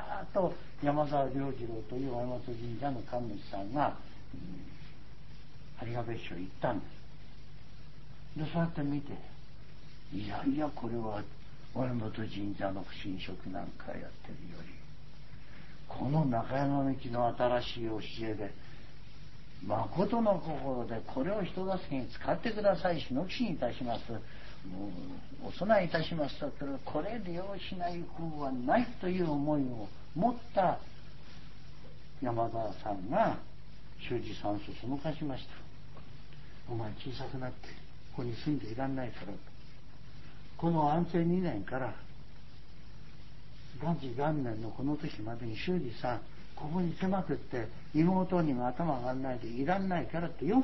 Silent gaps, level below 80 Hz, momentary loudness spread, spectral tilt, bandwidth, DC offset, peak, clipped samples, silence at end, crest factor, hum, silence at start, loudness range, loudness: none; -54 dBFS; 23 LU; -6 dB/octave; 6 kHz; 1%; -14 dBFS; under 0.1%; 0 s; 20 dB; none; 0 s; 8 LU; -35 LUFS